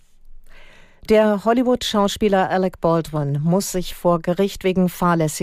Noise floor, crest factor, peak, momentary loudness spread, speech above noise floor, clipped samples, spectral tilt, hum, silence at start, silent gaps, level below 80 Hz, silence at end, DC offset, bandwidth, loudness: -43 dBFS; 14 dB; -4 dBFS; 5 LU; 25 dB; under 0.1%; -5.5 dB/octave; none; 0.3 s; none; -42 dBFS; 0 s; under 0.1%; 15.5 kHz; -19 LUFS